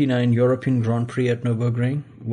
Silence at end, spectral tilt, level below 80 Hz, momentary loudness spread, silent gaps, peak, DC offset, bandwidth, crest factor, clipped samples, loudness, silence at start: 0 s; -8.5 dB/octave; -60 dBFS; 5 LU; none; -8 dBFS; under 0.1%; 9.6 kHz; 12 dB; under 0.1%; -21 LUFS; 0 s